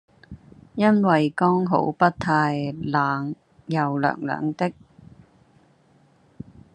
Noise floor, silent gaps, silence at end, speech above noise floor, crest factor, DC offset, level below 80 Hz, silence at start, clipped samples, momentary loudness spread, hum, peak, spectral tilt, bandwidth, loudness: -58 dBFS; none; 2.05 s; 37 dB; 20 dB; under 0.1%; -62 dBFS; 0.3 s; under 0.1%; 16 LU; none; -4 dBFS; -8 dB/octave; 9.8 kHz; -22 LUFS